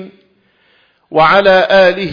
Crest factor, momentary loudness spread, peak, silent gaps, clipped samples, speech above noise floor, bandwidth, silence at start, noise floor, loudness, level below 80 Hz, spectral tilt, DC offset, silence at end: 12 dB; 5 LU; 0 dBFS; none; under 0.1%; 46 dB; 5.2 kHz; 0 s; -54 dBFS; -9 LUFS; -46 dBFS; -6 dB/octave; under 0.1%; 0 s